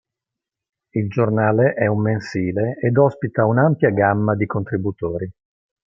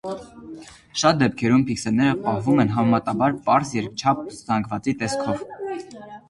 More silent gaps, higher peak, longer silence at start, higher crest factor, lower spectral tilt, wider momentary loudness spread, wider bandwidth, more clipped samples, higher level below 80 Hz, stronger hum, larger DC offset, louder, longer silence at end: neither; about the same, -2 dBFS vs -4 dBFS; first, 0.95 s vs 0.05 s; about the same, 18 dB vs 18 dB; first, -9.5 dB/octave vs -5.5 dB/octave; second, 9 LU vs 16 LU; second, 7.4 kHz vs 11.5 kHz; neither; about the same, -56 dBFS vs -54 dBFS; neither; neither; first, -19 LUFS vs -22 LUFS; first, 0.55 s vs 0.1 s